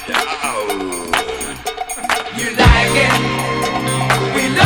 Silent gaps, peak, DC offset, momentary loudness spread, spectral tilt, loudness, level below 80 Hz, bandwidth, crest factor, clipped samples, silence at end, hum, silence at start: none; 0 dBFS; under 0.1%; 11 LU; -4 dB/octave; -16 LUFS; -26 dBFS; 19.5 kHz; 16 dB; under 0.1%; 0 s; none; 0 s